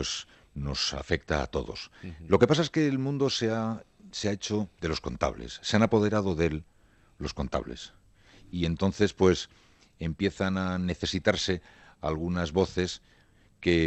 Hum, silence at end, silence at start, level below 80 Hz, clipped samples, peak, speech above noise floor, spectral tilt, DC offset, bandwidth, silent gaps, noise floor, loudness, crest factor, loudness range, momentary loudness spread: none; 0 s; 0 s; -48 dBFS; under 0.1%; -8 dBFS; 33 dB; -5.5 dB/octave; under 0.1%; 8.6 kHz; none; -61 dBFS; -29 LUFS; 22 dB; 3 LU; 15 LU